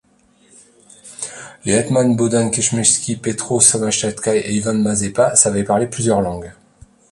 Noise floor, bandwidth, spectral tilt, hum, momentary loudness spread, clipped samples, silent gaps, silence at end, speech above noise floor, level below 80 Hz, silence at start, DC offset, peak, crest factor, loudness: -54 dBFS; 11.5 kHz; -4 dB/octave; none; 16 LU; under 0.1%; none; 0.6 s; 38 dB; -48 dBFS; 1.05 s; under 0.1%; 0 dBFS; 18 dB; -16 LUFS